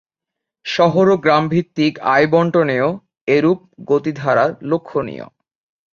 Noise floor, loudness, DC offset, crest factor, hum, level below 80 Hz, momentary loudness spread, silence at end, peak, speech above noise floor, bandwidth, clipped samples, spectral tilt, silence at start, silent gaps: -83 dBFS; -16 LUFS; under 0.1%; 16 dB; none; -58 dBFS; 10 LU; 0.65 s; -2 dBFS; 67 dB; 7.2 kHz; under 0.1%; -7 dB/octave; 0.65 s; 3.21-3.27 s